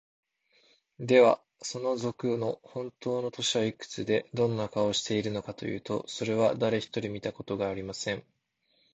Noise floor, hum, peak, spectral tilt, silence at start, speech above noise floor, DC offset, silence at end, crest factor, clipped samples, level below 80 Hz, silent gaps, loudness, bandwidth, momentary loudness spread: -73 dBFS; none; -8 dBFS; -4.5 dB/octave; 1 s; 44 dB; under 0.1%; 0.75 s; 22 dB; under 0.1%; -64 dBFS; none; -30 LUFS; 8.8 kHz; 12 LU